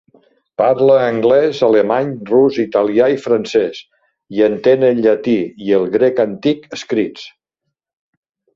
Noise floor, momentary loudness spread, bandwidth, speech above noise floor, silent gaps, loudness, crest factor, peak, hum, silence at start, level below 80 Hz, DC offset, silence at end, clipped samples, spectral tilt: -76 dBFS; 9 LU; 7.6 kHz; 63 dB; none; -15 LUFS; 14 dB; 0 dBFS; none; 0.6 s; -58 dBFS; under 0.1%; 1.25 s; under 0.1%; -6.5 dB/octave